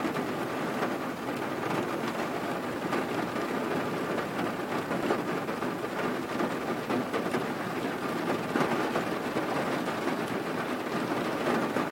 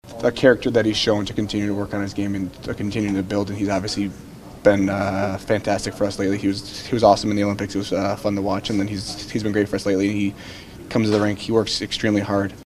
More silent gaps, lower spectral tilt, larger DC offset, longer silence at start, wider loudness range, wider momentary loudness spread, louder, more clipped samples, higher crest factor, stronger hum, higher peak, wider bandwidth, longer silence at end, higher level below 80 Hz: neither; about the same, -5.5 dB/octave vs -5.5 dB/octave; neither; about the same, 0 s vs 0.05 s; about the same, 1 LU vs 3 LU; second, 4 LU vs 9 LU; second, -31 LUFS vs -21 LUFS; neither; about the same, 18 dB vs 20 dB; neither; second, -12 dBFS vs 0 dBFS; about the same, 16.5 kHz vs 15 kHz; about the same, 0 s vs 0 s; second, -66 dBFS vs -46 dBFS